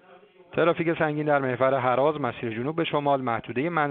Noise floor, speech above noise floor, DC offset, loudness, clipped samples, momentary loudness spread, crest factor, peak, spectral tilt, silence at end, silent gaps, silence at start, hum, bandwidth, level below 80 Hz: -53 dBFS; 29 dB; under 0.1%; -25 LUFS; under 0.1%; 7 LU; 18 dB; -8 dBFS; -5 dB/octave; 0 s; none; 0.5 s; none; 4.4 kHz; -64 dBFS